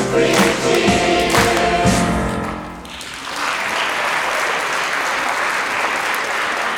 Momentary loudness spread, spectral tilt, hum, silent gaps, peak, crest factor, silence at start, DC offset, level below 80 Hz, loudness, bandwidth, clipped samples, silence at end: 11 LU; -3.5 dB/octave; none; none; -2 dBFS; 16 dB; 0 s; under 0.1%; -36 dBFS; -17 LUFS; over 20 kHz; under 0.1%; 0 s